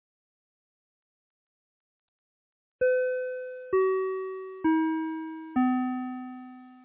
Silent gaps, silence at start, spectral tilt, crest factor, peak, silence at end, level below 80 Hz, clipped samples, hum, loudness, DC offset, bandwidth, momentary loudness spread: none; 2.8 s; -4.5 dB/octave; 16 dB; -16 dBFS; 0 s; -70 dBFS; under 0.1%; none; -29 LUFS; under 0.1%; 3.8 kHz; 12 LU